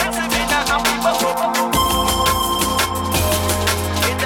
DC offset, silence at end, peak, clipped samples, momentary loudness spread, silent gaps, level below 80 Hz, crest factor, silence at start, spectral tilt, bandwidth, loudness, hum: under 0.1%; 0 s; -4 dBFS; under 0.1%; 3 LU; none; -32 dBFS; 14 dB; 0 s; -3 dB/octave; 19 kHz; -17 LUFS; none